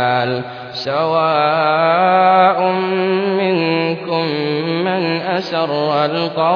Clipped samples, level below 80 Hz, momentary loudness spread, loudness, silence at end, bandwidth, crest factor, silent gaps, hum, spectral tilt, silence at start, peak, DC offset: under 0.1%; -64 dBFS; 7 LU; -16 LUFS; 0 s; 5.4 kHz; 14 dB; none; none; -7 dB/octave; 0 s; -2 dBFS; under 0.1%